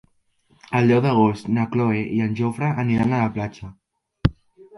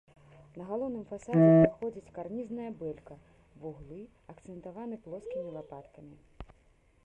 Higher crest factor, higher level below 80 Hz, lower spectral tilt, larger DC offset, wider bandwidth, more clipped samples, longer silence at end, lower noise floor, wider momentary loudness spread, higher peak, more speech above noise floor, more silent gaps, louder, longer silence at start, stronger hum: about the same, 20 dB vs 24 dB; first, -42 dBFS vs -60 dBFS; second, -8.5 dB/octave vs -10 dB/octave; neither; first, 11.5 kHz vs 8.6 kHz; neither; second, 0 s vs 0.6 s; about the same, -62 dBFS vs -65 dBFS; second, 10 LU vs 26 LU; first, -2 dBFS vs -8 dBFS; first, 42 dB vs 34 dB; neither; first, -21 LUFS vs -30 LUFS; first, 0.7 s vs 0.55 s; neither